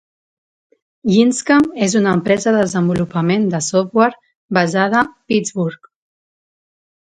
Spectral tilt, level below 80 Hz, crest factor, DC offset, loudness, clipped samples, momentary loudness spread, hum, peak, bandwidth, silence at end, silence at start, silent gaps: -5.5 dB/octave; -54 dBFS; 16 dB; under 0.1%; -16 LUFS; under 0.1%; 6 LU; none; 0 dBFS; 9.6 kHz; 1.35 s; 1.05 s; 4.35-4.49 s